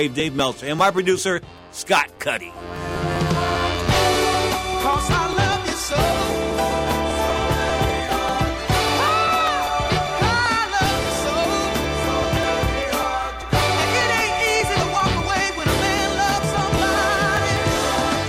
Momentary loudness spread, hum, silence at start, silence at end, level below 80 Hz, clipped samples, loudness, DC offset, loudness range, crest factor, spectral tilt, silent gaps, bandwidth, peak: 5 LU; none; 0 s; 0 s; -34 dBFS; under 0.1%; -20 LUFS; under 0.1%; 2 LU; 14 dB; -4 dB/octave; none; 16 kHz; -6 dBFS